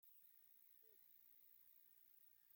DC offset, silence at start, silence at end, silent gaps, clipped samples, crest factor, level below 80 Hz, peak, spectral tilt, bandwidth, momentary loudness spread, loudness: under 0.1%; 0 s; 0 s; none; under 0.1%; 12 dB; under -90 dBFS; -58 dBFS; -0.5 dB/octave; 17 kHz; 1 LU; -67 LUFS